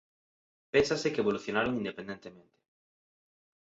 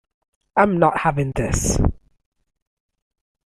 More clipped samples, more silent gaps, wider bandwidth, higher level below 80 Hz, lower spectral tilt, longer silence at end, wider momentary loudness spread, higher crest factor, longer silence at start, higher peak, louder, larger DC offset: neither; neither; second, 8 kHz vs 15 kHz; second, -62 dBFS vs -32 dBFS; about the same, -5 dB/octave vs -5.5 dB/octave; second, 1.25 s vs 1.6 s; first, 16 LU vs 7 LU; about the same, 22 dB vs 20 dB; first, 0.75 s vs 0.55 s; second, -12 dBFS vs -2 dBFS; second, -30 LUFS vs -20 LUFS; neither